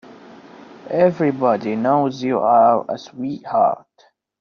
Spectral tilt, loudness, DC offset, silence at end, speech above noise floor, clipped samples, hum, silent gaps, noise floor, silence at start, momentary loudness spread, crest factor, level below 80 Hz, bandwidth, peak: -6 dB/octave; -18 LUFS; under 0.1%; 0.65 s; 40 dB; under 0.1%; none; none; -57 dBFS; 0.1 s; 14 LU; 16 dB; -64 dBFS; 6.8 kHz; -2 dBFS